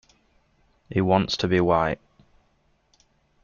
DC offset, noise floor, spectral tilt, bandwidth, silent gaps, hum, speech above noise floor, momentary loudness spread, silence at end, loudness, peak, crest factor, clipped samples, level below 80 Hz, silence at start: under 0.1%; -66 dBFS; -6.5 dB/octave; 7.2 kHz; none; none; 44 dB; 8 LU; 1.5 s; -23 LUFS; -6 dBFS; 20 dB; under 0.1%; -52 dBFS; 0.9 s